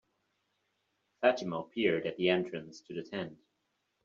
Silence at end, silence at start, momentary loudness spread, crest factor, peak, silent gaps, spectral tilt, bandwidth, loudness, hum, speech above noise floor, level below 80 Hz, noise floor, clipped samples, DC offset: 0.7 s; 1.2 s; 14 LU; 22 dB; -12 dBFS; none; -3.5 dB/octave; 7.6 kHz; -33 LUFS; none; 48 dB; -76 dBFS; -81 dBFS; under 0.1%; under 0.1%